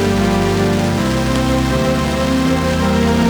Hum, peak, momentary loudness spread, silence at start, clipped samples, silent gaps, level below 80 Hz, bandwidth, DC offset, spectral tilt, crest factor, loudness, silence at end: none; -4 dBFS; 1 LU; 0 s; under 0.1%; none; -26 dBFS; over 20 kHz; under 0.1%; -6 dB/octave; 12 dB; -16 LUFS; 0 s